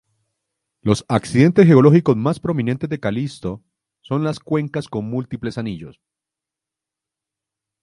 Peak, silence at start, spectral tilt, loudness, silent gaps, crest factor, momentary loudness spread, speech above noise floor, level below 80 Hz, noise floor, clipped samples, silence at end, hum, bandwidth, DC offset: 0 dBFS; 0.85 s; -8 dB/octave; -18 LUFS; none; 20 dB; 16 LU; 69 dB; -52 dBFS; -86 dBFS; under 0.1%; 1.9 s; none; 11.5 kHz; under 0.1%